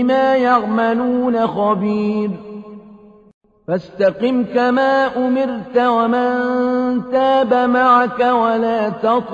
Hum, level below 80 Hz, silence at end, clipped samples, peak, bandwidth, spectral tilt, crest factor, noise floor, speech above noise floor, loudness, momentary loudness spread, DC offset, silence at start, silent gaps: none; -56 dBFS; 0 s; under 0.1%; -2 dBFS; 7.2 kHz; -7.5 dB/octave; 14 dB; -43 dBFS; 27 dB; -16 LUFS; 8 LU; under 0.1%; 0 s; 3.34-3.41 s